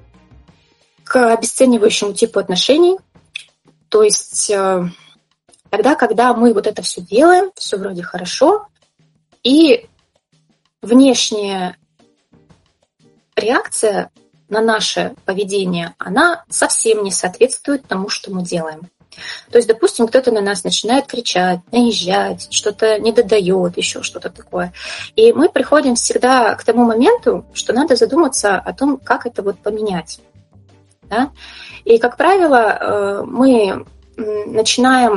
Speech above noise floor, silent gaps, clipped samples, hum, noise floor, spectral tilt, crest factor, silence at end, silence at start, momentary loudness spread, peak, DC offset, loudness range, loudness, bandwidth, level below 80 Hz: 45 dB; none; under 0.1%; none; -60 dBFS; -3.5 dB/octave; 16 dB; 0 s; 1.1 s; 12 LU; 0 dBFS; under 0.1%; 4 LU; -14 LUFS; 11.5 kHz; -54 dBFS